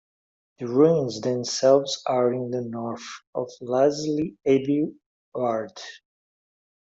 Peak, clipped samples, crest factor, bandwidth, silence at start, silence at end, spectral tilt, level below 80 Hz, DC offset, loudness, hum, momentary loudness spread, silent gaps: -6 dBFS; under 0.1%; 18 dB; 7.8 kHz; 0.6 s; 1 s; -5.5 dB/octave; -68 dBFS; under 0.1%; -24 LUFS; none; 16 LU; 3.27-3.33 s, 5.06-5.32 s